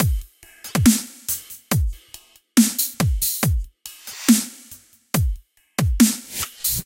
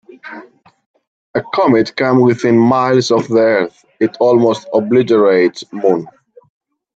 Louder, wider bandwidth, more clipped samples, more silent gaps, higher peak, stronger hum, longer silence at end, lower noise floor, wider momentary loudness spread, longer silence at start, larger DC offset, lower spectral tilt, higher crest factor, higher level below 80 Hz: second, -21 LUFS vs -13 LUFS; first, 17 kHz vs 8 kHz; neither; second, none vs 0.86-0.94 s, 1.07-1.34 s; about the same, -2 dBFS vs 0 dBFS; neither; second, 0.05 s vs 0.9 s; first, -47 dBFS vs -39 dBFS; first, 18 LU vs 11 LU; second, 0 s vs 0.25 s; neither; second, -4 dB/octave vs -6.5 dB/octave; first, 20 dB vs 14 dB; first, -30 dBFS vs -60 dBFS